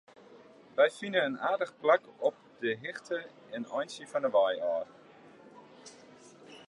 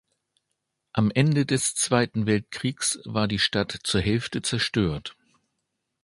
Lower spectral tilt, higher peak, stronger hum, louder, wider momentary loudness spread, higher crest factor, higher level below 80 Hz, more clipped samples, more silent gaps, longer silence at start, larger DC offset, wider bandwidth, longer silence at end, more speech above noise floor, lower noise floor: about the same, -4 dB/octave vs -4 dB/octave; second, -12 dBFS vs -6 dBFS; neither; second, -31 LUFS vs -24 LUFS; first, 20 LU vs 6 LU; about the same, 20 dB vs 20 dB; second, -84 dBFS vs -48 dBFS; neither; neither; second, 0.3 s vs 0.95 s; neither; about the same, 11.5 kHz vs 11.5 kHz; second, 0.05 s vs 0.9 s; second, 25 dB vs 55 dB; second, -56 dBFS vs -80 dBFS